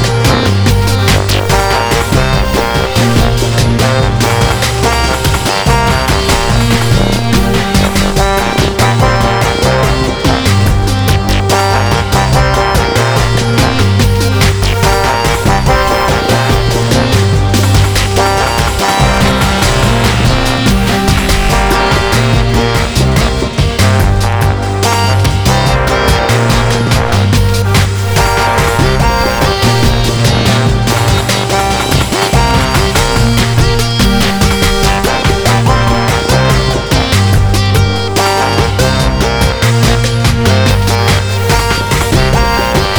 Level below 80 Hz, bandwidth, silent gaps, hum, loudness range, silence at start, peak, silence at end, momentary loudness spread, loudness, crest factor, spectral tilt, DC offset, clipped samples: -18 dBFS; over 20 kHz; none; none; 1 LU; 0 s; 0 dBFS; 0 s; 2 LU; -10 LUFS; 10 dB; -4.5 dB/octave; under 0.1%; under 0.1%